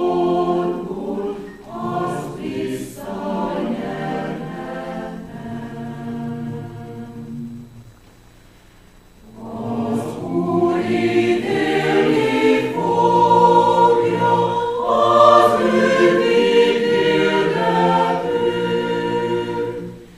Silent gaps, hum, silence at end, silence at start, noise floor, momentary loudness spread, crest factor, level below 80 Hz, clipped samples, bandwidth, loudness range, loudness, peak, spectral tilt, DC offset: none; none; 0 s; 0 s; -47 dBFS; 18 LU; 18 dB; -50 dBFS; under 0.1%; 14 kHz; 17 LU; -18 LUFS; 0 dBFS; -6 dB/octave; under 0.1%